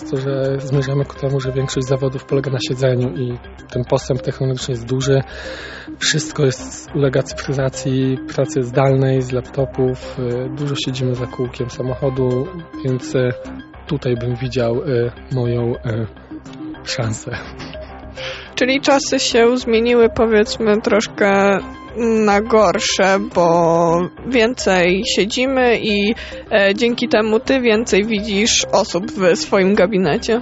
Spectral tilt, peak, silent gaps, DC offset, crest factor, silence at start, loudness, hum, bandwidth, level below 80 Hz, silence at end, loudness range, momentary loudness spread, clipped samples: -5 dB/octave; -2 dBFS; none; under 0.1%; 16 dB; 0 s; -17 LUFS; none; 8.2 kHz; -40 dBFS; 0 s; 6 LU; 12 LU; under 0.1%